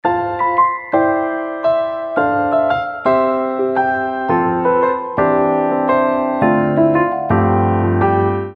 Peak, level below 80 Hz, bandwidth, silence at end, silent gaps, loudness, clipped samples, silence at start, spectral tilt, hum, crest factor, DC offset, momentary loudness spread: -2 dBFS; -48 dBFS; 5.2 kHz; 0 s; none; -16 LUFS; under 0.1%; 0.05 s; -10 dB/octave; none; 14 dB; under 0.1%; 4 LU